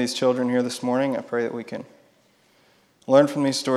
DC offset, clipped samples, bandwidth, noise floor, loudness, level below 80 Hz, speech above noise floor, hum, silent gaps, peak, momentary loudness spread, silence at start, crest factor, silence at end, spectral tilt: under 0.1%; under 0.1%; 13.5 kHz; -60 dBFS; -22 LUFS; -76 dBFS; 38 dB; none; none; -2 dBFS; 16 LU; 0 s; 20 dB; 0 s; -5 dB/octave